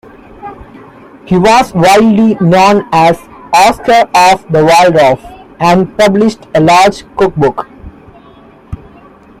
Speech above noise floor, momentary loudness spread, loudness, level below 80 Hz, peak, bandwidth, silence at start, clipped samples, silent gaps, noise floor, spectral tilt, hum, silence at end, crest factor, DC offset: 30 dB; 22 LU; -8 LUFS; -38 dBFS; 0 dBFS; 16 kHz; 0.45 s; 0.1%; none; -38 dBFS; -5.5 dB/octave; none; 0.65 s; 10 dB; under 0.1%